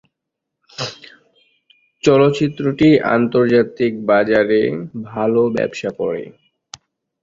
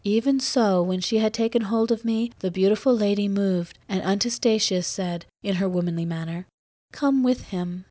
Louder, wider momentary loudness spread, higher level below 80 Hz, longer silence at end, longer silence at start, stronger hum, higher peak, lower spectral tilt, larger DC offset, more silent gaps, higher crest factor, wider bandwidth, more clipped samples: first, -16 LUFS vs -24 LUFS; first, 14 LU vs 8 LU; about the same, -54 dBFS vs -58 dBFS; first, 0.9 s vs 0.05 s; first, 0.8 s vs 0.05 s; neither; first, 0 dBFS vs -10 dBFS; about the same, -6.5 dB/octave vs -5.5 dB/octave; neither; second, none vs 6.54-6.88 s; about the same, 18 dB vs 14 dB; about the same, 7.6 kHz vs 8 kHz; neither